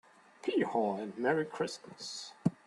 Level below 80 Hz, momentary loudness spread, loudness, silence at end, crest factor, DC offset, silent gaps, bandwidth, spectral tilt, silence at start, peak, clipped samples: -74 dBFS; 10 LU; -35 LUFS; 0.15 s; 20 dB; under 0.1%; none; 12 kHz; -5.5 dB/octave; 0.45 s; -14 dBFS; under 0.1%